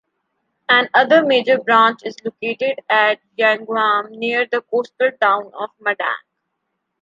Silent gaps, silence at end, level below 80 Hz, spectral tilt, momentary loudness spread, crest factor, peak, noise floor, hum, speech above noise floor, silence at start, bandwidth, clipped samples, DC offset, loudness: none; 0.85 s; -74 dBFS; -4.5 dB/octave; 12 LU; 16 dB; -2 dBFS; -75 dBFS; none; 58 dB; 0.7 s; 7.6 kHz; under 0.1%; under 0.1%; -17 LUFS